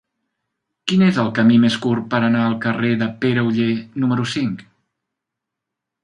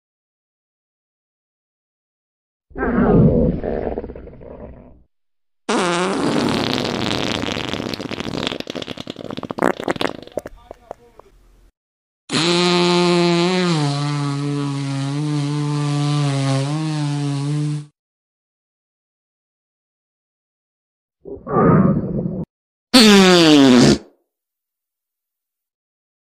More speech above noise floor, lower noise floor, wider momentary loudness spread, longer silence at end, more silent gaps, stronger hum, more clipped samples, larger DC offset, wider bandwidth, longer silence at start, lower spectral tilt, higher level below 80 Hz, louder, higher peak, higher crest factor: second, 65 dB vs over 74 dB; second, -82 dBFS vs under -90 dBFS; second, 8 LU vs 19 LU; second, 1.4 s vs 2.35 s; second, none vs 11.77-12.28 s, 17.99-21.09 s, 22.50-22.87 s; neither; neither; neither; second, 10 kHz vs 15.5 kHz; second, 0.85 s vs 2.75 s; first, -6.5 dB/octave vs -5 dB/octave; second, -58 dBFS vs -40 dBFS; about the same, -18 LUFS vs -17 LUFS; about the same, -2 dBFS vs 0 dBFS; about the same, 16 dB vs 20 dB